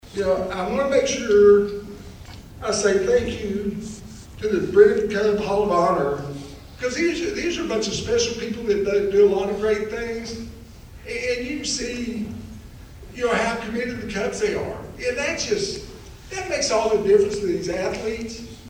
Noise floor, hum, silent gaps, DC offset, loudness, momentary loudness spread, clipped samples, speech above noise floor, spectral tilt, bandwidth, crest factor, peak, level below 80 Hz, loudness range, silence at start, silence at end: -41 dBFS; none; none; under 0.1%; -22 LUFS; 18 LU; under 0.1%; 20 dB; -4 dB/octave; 15 kHz; 20 dB; -2 dBFS; -44 dBFS; 6 LU; 0.05 s; 0 s